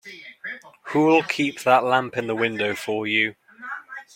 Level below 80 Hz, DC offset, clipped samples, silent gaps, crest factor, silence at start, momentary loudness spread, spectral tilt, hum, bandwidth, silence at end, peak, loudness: -70 dBFS; under 0.1%; under 0.1%; none; 20 dB; 0.05 s; 17 LU; -5 dB/octave; none; 16.5 kHz; 0.15 s; -2 dBFS; -21 LUFS